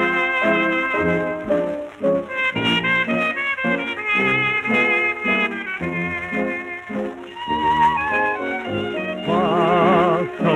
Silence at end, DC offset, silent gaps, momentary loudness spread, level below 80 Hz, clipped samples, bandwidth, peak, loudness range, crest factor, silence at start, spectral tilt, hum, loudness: 0 s; under 0.1%; none; 8 LU; -52 dBFS; under 0.1%; 12.5 kHz; -4 dBFS; 3 LU; 16 dB; 0 s; -6 dB/octave; none; -19 LUFS